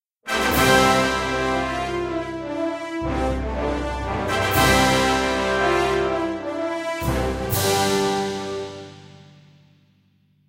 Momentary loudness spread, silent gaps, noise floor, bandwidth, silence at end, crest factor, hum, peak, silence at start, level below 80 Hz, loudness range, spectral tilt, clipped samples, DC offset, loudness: 11 LU; none; -61 dBFS; 16 kHz; 1.4 s; 20 dB; none; -2 dBFS; 0.25 s; -36 dBFS; 5 LU; -4 dB/octave; under 0.1%; under 0.1%; -21 LUFS